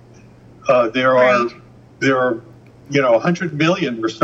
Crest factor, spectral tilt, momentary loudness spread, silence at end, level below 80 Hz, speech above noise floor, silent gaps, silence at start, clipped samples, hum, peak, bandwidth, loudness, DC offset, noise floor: 16 dB; -6 dB/octave; 8 LU; 0 s; -58 dBFS; 28 dB; none; 0.65 s; under 0.1%; none; -2 dBFS; 7.8 kHz; -17 LUFS; under 0.1%; -44 dBFS